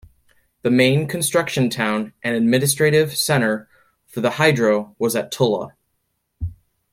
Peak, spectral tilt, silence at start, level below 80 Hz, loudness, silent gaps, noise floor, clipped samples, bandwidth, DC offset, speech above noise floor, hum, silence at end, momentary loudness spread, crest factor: -2 dBFS; -4.5 dB/octave; 0.65 s; -50 dBFS; -19 LUFS; none; -72 dBFS; under 0.1%; 16.5 kHz; under 0.1%; 53 dB; none; 0.4 s; 14 LU; 18 dB